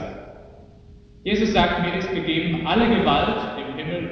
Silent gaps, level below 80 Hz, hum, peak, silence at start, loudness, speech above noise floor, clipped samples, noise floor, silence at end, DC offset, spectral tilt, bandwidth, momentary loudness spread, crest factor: none; -42 dBFS; none; -4 dBFS; 0 s; -22 LUFS; 26 dB; under 0.1%; -47 dBFS; 0 s; under 0.1%; -6 dB/octave; 6.6 kHz; 11 LU; 20 dB